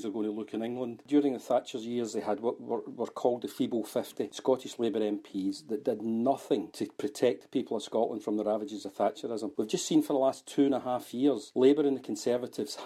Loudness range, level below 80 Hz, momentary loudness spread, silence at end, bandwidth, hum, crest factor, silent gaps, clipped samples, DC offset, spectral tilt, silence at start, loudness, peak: 4 LU; -80 dBFS; 8 LU; 0 s; 14.5 kHz; none; 18 dB; none; under 0.1%; under 0.1%; -5 dB/octave; 0 s; -31 LUFS; -12 dBFS